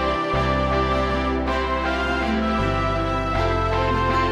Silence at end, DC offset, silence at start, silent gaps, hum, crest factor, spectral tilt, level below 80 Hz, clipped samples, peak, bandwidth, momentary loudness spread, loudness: 0 s; under 0.1%; 0 s; none; none; 12 dB; -6.5 dB/octave; -30 dBFS; under 0.1%; -10 dBFS; 11 kHz; 2 LU; -22 LUFS